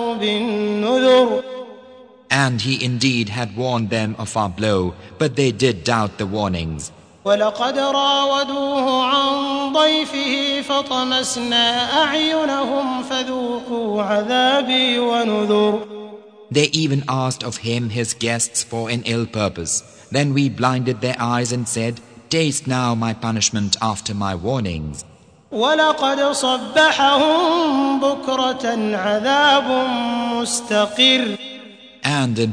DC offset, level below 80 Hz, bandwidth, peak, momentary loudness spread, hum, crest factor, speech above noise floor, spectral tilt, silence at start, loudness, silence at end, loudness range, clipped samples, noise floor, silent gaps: under 0.1%; -50 dBFS; 10 kHz; 0 dBFS; 9 LU; none; 18 dB; 25 dB; -4 dB/octave; 0 s; -18 LUFS; 0 s; 4 LU; under 0.1%; -44 dBFS; none